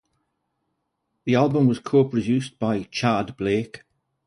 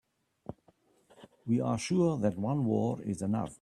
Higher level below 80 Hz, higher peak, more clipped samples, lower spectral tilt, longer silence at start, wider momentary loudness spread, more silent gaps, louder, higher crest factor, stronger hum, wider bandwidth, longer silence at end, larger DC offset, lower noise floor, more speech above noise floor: first, -58 dBFS vs -66 dBFS; first, -6 dBFS vs -16 dBFS; neither; about the same, -7 dB/octave vs -7 dB/octave; first, 1.25 s vs 0.5 s; second, 7 LU vs 20 LU; neither; first, -22 LUFS vs -31 LUFS; about the same, 18 dB vs 16 dB; neither; about the same, 11 kHz vs 12 kHz; first, 0.5 s vs 0.05 s; neither; first, -76 dBFS vs -67 dBFS; first, 55 dB vs 37 dB